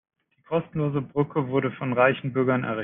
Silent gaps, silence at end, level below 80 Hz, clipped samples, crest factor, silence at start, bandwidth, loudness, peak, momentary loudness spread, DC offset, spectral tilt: none; 0 s; -64 dBFS; under 0.1%; 20 dB; 0.5 s; 3.8 kHz; -25 LUFS; -6 dBFS; 6 LU; under 0.1%; -6 dB/octave